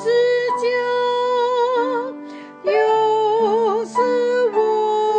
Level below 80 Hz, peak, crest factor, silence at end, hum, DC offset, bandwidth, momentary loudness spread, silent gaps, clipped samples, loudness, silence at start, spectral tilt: -80 dBFS; -6 dBFS; 12 dB; 0 s; none; under 0.1%; 9 kHz; 7 LU; none; under 0.1%; -18 LUFS; 0 s; -4 dB/octave